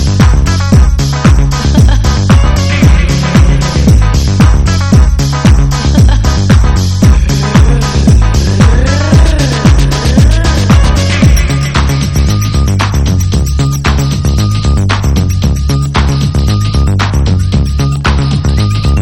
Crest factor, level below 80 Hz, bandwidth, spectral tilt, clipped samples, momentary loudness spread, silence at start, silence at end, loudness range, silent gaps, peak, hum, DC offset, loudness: 8 dB; -10 dBFS; 14.5 kHz; -6 dB/octave; 2%; 3 LU; 0 s; 0 s; 3 LU; none; 0 dBFS; none; 2%; -9 LUFS